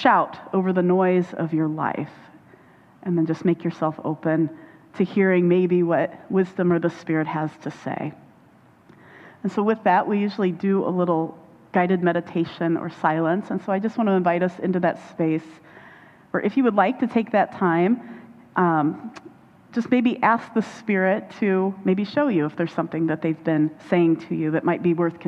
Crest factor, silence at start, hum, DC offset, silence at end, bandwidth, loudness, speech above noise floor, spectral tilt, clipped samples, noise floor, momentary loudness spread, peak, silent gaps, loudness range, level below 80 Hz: 20 dB; 0 s; none; under 0.1%; 0 s; 7.8 kHz; -22 LUFS; 32 dB; -8.5 dB/octave; under 0.1%; -53 dBFS; 9 LU; -2 dBFS; none; 4 LU; -68 dBFS